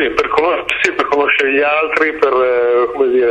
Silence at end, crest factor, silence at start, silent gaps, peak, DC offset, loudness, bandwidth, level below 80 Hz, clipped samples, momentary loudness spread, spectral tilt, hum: 0 s; 14 dB; 0 s; none; 0 dBFS; under 0.1%; -13 LUFS; 9.4 kHz; -46 dBFS; under 0.1%; 2 LU; -3.5 dB/octave; none